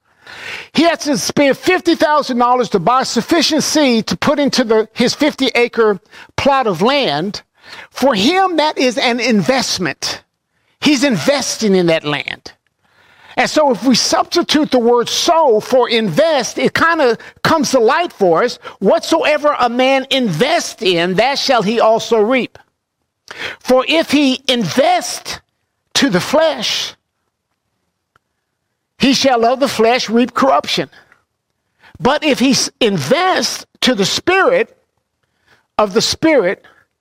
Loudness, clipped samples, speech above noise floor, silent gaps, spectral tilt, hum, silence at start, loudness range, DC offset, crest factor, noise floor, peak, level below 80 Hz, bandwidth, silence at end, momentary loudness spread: -14 LUFS; under 0.1%; 58 dB; none; -3.5 dB/octave; none; 0.25 s; 3 LU; under 0.1%; 12 dB; -71 dBFS; -2 dBFS; -52 dBFS; 16 kHz; 0.45 s; 7 LU